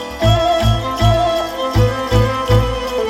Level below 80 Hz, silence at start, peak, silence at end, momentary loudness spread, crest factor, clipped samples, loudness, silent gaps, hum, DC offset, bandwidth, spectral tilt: -24 dBFS; 0 s; -2 dBFS; 0 s; 4 LU; 14 dB; under 0.1%; -15 LUFS; none; none; under 0.1%; 15.5 kHz; -6 dB/octave